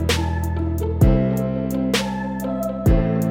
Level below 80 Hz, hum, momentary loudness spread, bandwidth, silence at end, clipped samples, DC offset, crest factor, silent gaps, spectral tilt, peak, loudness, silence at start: -26 dBFS; none; 7 LU; 18.5 kHz; 0 s; under 0.1%; under 0.1%; 16 dB; none; -6.5 dB/octave; -4 dBFS; -21 LUFS; 0 s